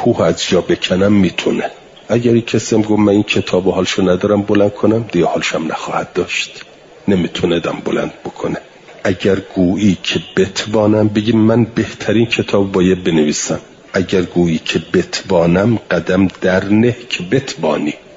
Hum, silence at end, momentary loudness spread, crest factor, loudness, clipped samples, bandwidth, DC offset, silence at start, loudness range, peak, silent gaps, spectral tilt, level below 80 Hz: none; 0.2 s; 7 LU; 14 dB; -15 LUFS; under 0.1%; 7.8 kHz; under 0.1%; 0 s; 4 LU; -2 dBFS; none; -5.5 dB/octave; -48 dBFS